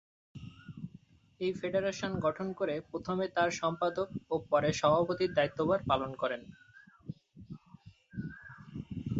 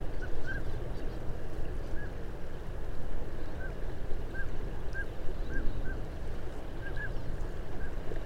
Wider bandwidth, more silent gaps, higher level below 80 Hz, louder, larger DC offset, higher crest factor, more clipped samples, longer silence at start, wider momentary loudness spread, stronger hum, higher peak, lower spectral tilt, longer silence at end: first, 8 kHz vs 5.2 kHz; neither; second, -60 dBFS vs -36 dBFS; first, -33 LUFS vs -41 LUFS; neither; first, 20 dB vs 14 dB; neither; first, 0.35 s vs 0 s; first, 21 LU vs 4 LU; neither; about the same, -14 dBFS vs -14 dBFS; second, -5.5 dB/octave vs -7 dB/octave; about the same, 0 s vs 0 s